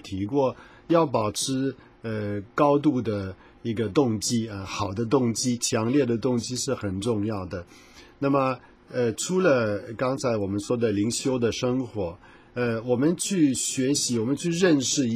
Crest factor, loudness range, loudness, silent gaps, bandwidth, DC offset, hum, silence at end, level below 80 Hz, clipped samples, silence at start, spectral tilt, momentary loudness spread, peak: 18 dB; 2 LU; -25 LUFS; none; 15.5 kHz; under 0.1%; none; 0 s; -54 dBFS; under 0.1%; 0.05 s; -5 dB/octave; 10 LU; -8 dBFS